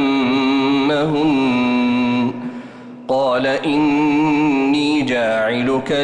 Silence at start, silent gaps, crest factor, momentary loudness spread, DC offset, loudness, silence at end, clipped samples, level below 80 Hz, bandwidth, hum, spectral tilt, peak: 0 s; none; 8 dB; 7 LU; under 0.1%; -17 LUFS; 0 s; under 0.1%; -52 dBFS; 9.4 kHz; none; -6 dB/octave; -8 dBFS